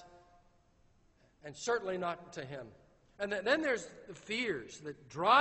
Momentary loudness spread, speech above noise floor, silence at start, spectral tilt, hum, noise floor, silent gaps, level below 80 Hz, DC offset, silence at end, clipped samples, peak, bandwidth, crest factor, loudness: 18 LU; 33 dB; 0 s; -3.5 dB/octave; none; -68 dBFS; none; -70 dBFS; under 0.1%; 0 s; under 0.1%; -14 dBFS; 8.2 kHz; 24 dB; -36 LUFS